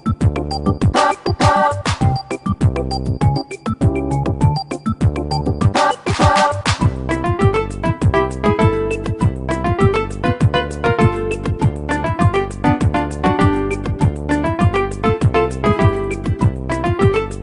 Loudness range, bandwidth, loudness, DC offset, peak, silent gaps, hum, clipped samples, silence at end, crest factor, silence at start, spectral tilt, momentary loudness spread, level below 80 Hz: 2 LU; 11 kHz; -17 LUFS; under 0.1%; 0 dBFS; none; none; under 0.1%; 0 s; 16 dB; 0.05 s; -6.5 dB/octave; 6 LU; -28 dBFS